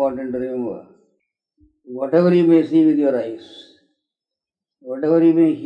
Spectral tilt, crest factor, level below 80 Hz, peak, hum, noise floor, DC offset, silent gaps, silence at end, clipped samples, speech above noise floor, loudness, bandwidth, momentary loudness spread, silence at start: -9.5 dB/octave; 16 dB; -64 dBFS; -4 dBFS; none; -87 dBFS; under 0.1%; none; 0 s; under 0.1%; 70 dB; -17 LUFS; 5.2 kHz; 18 LU; 0 s